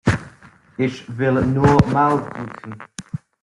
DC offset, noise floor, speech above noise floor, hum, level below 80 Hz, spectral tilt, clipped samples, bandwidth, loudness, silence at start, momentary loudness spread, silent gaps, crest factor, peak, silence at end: under 0.1%; -46 dBFS; 28 dB; none; -42 dBFS; -7.5 dB/octave; under 0.1%; 11.5 kHz; -18 LUFS; 0.05 s; 20 LU; none; 18 dB; -2 dBFS; 0.25 s